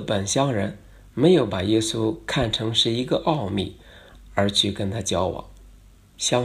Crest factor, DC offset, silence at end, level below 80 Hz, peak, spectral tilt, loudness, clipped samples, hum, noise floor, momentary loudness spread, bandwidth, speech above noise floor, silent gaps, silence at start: 18 dB; under 0.1%; 0 s; -48 dBFS; -4 dBFS; -4.5 dB/octave; -23 LUFS; under 0.1%; none; -50 dBFS; 9 LU; 14.5 kHz; 28 dB; none; 0 s